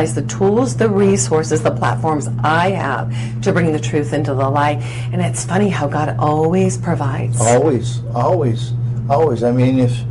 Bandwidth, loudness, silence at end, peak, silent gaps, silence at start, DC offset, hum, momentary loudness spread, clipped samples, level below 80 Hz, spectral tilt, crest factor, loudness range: 11.5 kHz; -16 LUFS; 0 s; -2 dBFS; none; 0 s; under 0.1%; none; 6 LU; under 0.1%; -42 dBFS; -6 dB/octave; 14 dB; 2 LU